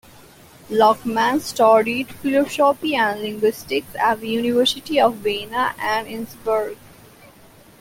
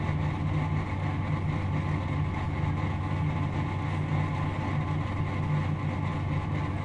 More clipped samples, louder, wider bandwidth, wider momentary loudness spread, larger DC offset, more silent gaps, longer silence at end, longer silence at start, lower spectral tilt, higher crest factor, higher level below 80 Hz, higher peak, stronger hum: neither; first, -19 LUFS vs -30 LUFS; first, 17 kHz vs 8.2 kHz; first, 8 LU vs 2 LU; neither; neither; first, 1.05 s vs 0 s; first, 0.7 s vs 0 s; second, -4 dB/octave vs -8 dB/octave; first, 18 dB vs 12 dB; second, -56 dBFS vs -44 dBFS; first, -2 dBFS vs -16 dBFS; neither